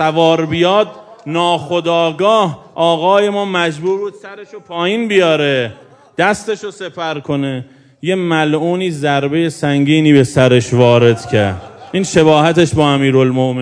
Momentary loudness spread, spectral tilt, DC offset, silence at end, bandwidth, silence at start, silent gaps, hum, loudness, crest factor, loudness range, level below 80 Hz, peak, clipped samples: 13 LU; -6 dB/octave; under 0.1%; 0 s; 11 kHz; 0 s; none; none; -13 LUFS; 14 dB; 6 LU; -50 dBFS; 0 dBFS; 0.2%